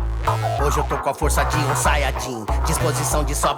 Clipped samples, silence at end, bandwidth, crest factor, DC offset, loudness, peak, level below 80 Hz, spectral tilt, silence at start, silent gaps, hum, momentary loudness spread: under 0.1%; 0 s; 18.5 kHz; 12 dB; under 0.1%; -21 LUFS; -8 dBFS; -24 dBFS; -4 dB/octave; 0 s; none; none; 5 LU